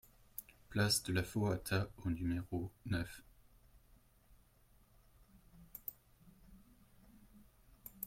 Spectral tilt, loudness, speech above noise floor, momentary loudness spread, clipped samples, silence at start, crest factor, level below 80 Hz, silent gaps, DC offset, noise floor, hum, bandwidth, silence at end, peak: -4.5 dB/octave; -40 LUFS; 31 dB; 18 LU; under 0.1%; 0.4 s; 22 dB; -62 dBFS; none; under 0.1%; -69 dBFS; none; 16.5 kHz; 0 s; -20 dBFS